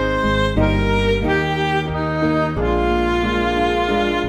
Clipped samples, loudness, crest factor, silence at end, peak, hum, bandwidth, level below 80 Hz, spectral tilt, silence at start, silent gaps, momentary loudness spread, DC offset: under 0.1%; -18 LUFS; 14 dB; 0 s; -4 dBFS; none; 12 kHz; -28 dBFS; -6.5 dB/octave; 0 s; none; 2 LU; 0.1%